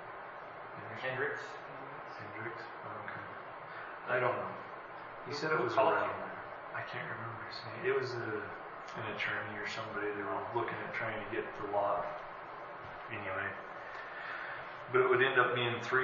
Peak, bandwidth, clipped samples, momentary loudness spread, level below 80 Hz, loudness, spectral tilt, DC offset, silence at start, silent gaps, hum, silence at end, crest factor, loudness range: -14 dBFS; 7 kHz; under 0.1%; 16 LU; -70 dBFS; -37 LUFS; -3 dB/octave; under 0.1%; 0 s; none; none; 0 s; 24 dB; 6 LU